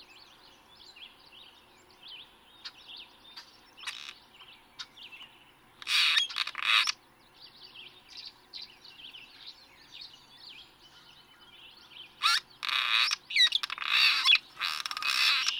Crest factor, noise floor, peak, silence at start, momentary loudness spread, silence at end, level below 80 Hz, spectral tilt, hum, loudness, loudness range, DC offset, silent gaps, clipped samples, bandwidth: 24 dB; -59 dBFS; -10 dBFS; 0 s; 25 LU; 0 s; -74 dBFS; 3 dB/octave; none; -26 LUFS; 23 LU; under 0.1%; none; under 0.1%; over 20 kHz